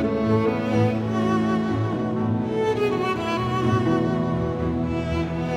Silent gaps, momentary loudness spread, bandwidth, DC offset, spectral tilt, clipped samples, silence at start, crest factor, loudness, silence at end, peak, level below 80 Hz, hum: none; 4 LU; 10 kHz; under 0.1%; -8 dB/octave; under 0.1%; 0 s; 14 dB; -23 LUFS; 0 s; -8 dBFS; -42 dBFS; none